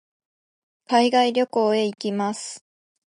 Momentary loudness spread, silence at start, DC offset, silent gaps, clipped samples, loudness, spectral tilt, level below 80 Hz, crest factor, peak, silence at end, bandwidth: 14 LU; 0.9 s; under 0.1%; none; under 0.1%; -21 LUFS; -4 dB/octave; -78 dBFS; 18 dB; -6 dBFS; 0.6 s; 11.5 kHz